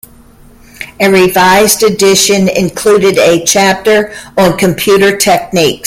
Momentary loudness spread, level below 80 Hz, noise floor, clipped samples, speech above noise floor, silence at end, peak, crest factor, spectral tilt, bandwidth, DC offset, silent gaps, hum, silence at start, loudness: 5 LU; -40 dBFS; -38 dBFS; 0.1%; 30 dB; 0 s; 0 dBFS; 8 dB; -3.5 dB/octave; 17 kHz; under 0.1%; none; none; 0.8 s; -8 LUFS